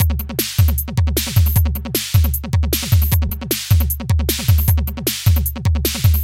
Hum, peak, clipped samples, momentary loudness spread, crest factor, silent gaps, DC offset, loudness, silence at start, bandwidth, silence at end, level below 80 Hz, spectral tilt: none; 0 dBFS; under 0.1%; 4 LU; 16 dB; none; under 0.1%; -17 LUFS; 0 s; 17 kHz; 0 s; -20 dBFS; -4.5 dB/octave